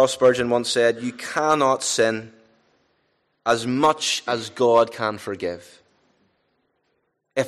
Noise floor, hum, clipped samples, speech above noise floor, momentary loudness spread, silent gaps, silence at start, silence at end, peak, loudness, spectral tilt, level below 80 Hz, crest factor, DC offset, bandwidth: -72 dBFS; none; under 0.1%; 51 dB; 11 LU; none; 0 s; 0 s; -6 dBFS; -21 LUFS; -3.5 dB/octave; -64 dBFS; 16 dB; under 0.1%; 13 kHz